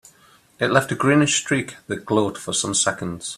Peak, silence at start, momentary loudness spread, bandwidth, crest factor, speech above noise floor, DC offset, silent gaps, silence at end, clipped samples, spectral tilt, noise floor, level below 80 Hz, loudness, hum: 0 dBFS; 0.6 s; 9 LU; 14 kHz; 22 dB; 33 dB; under 0.1%; none; 0 s; under 0.1%; -3.5 dB/octave; -54 dBFS; -58 dBFS; -21 LUFS; none